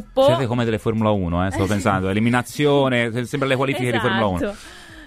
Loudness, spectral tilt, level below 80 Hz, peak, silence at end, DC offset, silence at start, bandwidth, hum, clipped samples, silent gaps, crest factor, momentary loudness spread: -20 LUFS; -6 dB/octave; -44 dBFS; -4 dBFS; 0 s; under 0.1%; 0 s; 15.5 kHz; none; under 0.1%; none; 16 dB; 6 LU